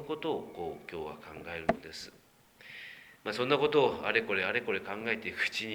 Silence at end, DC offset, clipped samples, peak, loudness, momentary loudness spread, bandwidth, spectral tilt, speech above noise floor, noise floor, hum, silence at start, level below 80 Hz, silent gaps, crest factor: 0 s; under 0.1%; under 0.1%; -10 dBFS; -32 LUFS; 18 LU; over 20 kHz; -4.5 dB/octave; 24 dB; -56 dBFS; none; 0 s; -66 dBFS; none; 24 dB